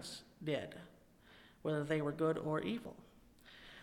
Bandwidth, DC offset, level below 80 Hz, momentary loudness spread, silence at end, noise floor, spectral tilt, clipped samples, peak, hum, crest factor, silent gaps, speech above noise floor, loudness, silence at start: 16.5 kHz; under 0.1%; -70 dBFS; 22 LU; 0 s; -64 dBFS; -6 dB/octave; under 0.1%; -24 dBFS; none; 18 dB; none; 25 dB; -40 LUFS; 0 s